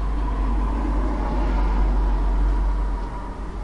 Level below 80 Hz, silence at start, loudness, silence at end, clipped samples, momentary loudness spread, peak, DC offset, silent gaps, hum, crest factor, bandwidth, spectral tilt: -22 dBFS; 0 s; -25 LUFS; 0 s; under 0.1%; 7 LU; -12 dBFS; under 0.1%; none; none; 10 dB; 5.6 kHz; -8 dB/octave